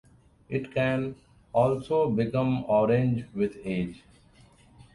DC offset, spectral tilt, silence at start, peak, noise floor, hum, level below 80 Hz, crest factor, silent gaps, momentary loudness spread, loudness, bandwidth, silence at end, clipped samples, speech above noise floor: under 0.1%; -8.5 dB/octave; 0.5 s; -10 dBFS; -57 dBFS; none; -56 dBFS; 18 dB; none; 9 LU; -27 LUFS; 11 kHz; 0.1 s; under 0.1%; 31 dB